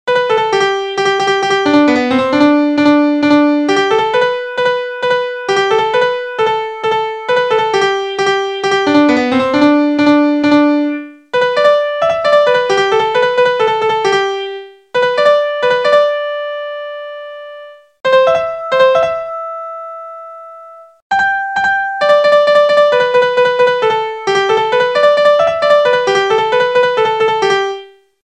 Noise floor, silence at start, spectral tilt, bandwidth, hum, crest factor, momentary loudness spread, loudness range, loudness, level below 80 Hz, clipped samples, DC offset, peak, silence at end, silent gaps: -36 dBFS; 0.05 s; -4 dB/octave; 9.8 kHz; none; 12 dB; 11 LU; 4 LU; -12 LUFS; -56 dBFS; under 0.1%; 0.1%; 0 dBFS; 0.4 s; 21.02-21.10 s